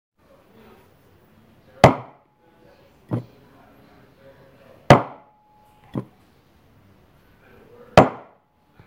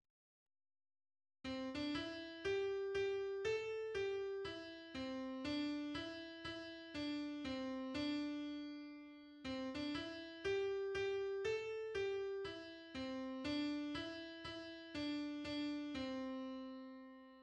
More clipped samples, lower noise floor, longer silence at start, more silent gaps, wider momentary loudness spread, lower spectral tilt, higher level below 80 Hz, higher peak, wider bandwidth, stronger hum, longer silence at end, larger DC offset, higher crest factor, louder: neither; second, -58 dBFS vs under -90 dBFS; first, 1.85 s vs 1.45 s; neither; first, 18 LU vs 9 LU; first, -6.5 dB/octave vs -5 dB/octave; first, -46 dBFS vs -70 dBFS; first, 0 dBFS vs -30 dBFS; first, 16 kHz vs 9.8 kHz; neither; first, 0.7 s vs 0 s; neither; first, 24 dB vs 14 dB; first, -19 LUFS vs -45 LUFS